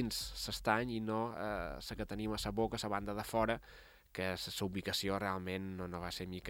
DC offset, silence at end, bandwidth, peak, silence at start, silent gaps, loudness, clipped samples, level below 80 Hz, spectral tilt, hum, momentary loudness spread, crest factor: under 0.1%; 0 s; 17.5 kHz; -16 dBFS; 0 s; none; -39 LUFS; under 0.1%; -54 dBFS; -4.5 dB/octave; none; 8 LU; 24 dB